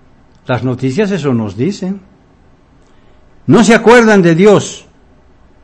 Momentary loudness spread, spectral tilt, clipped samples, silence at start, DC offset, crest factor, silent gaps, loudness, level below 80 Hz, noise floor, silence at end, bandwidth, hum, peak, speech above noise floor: 18 LU; -6 dB/octave; 2%; 0.5 s; under 0.1%; 12 dB; none; -10 LUFS; -44 dBFS; -45 dBFS; 0.85 s; 11 kHz; none; 0 dBFS; 36 dB